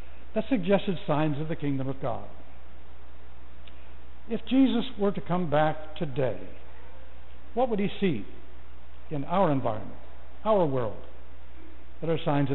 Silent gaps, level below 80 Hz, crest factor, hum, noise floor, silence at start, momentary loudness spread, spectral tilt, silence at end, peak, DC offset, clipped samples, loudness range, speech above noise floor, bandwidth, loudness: none; -50 dBFS; 18 dB; none; -49 dBFS; 0 s; 25 LU; -6 dB/octave; 0 s; -12 dBFS; 4%; under 0.1%; 4 LU; 22 dB; 4.2 kHz; -28 LUFS